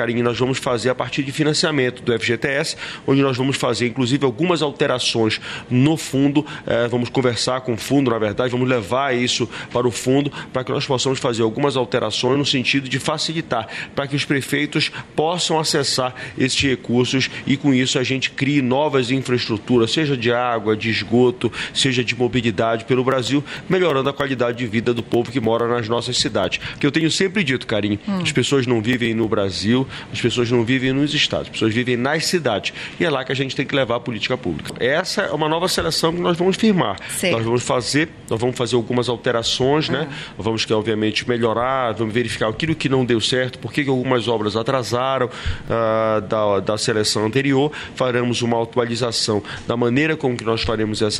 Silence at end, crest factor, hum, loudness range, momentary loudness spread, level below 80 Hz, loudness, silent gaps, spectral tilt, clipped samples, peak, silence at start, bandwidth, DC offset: 0 s; 14 dB; none; 2 LU; 5 LU; -46 dBFS; -19 LUFS; none; -4.5 dB/octave; under 0.1%; -4 dBFS; 0 s; 13 kHz; under 0.1%